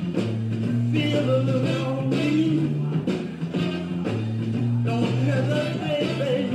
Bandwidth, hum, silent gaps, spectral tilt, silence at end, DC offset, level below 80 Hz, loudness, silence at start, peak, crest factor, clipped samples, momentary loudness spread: 10 kHz; none; none; -7.5 dB/octave; 0 s; under 0.1%; -58 dBFS; -24 LUFS; 0 s; -10 dBFS; 12 dB; under 0.1%; 5 LU